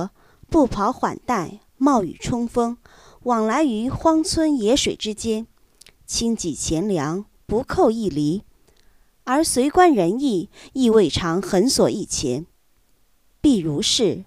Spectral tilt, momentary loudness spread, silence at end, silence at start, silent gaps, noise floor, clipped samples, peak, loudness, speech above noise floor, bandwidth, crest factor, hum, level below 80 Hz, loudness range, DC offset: -4.5 dB/octave; 10 LU; 0.05 s; 0 s; none; -62 dBFS; under 0.1%; -2 dBFS; -21 LUFS; 42 dB; 15.5 kHz; 20 dB; none; -44 dBFS; 4 LU; under 0.1%